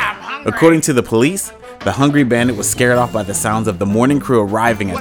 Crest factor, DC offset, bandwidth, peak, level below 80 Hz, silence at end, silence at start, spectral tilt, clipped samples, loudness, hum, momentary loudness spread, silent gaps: 14 dB; under 0.1%; over 20 kHz; 0 dBFS; -44 dBFS; 0 s; 0 s; -5 dB/octave; under 0.1%; -15 LUFS; none; 9 LU; none